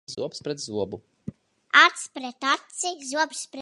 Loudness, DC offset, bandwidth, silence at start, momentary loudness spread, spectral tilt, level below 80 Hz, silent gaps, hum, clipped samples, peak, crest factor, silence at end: -24 LUFS; under 0.1%; 11.5 kHz; 0.1 s; 22 LU; -1.5 dB/octave; -66 dBFS; none; none; under 0.1%; -2 dBFS; 24 dB; 0 s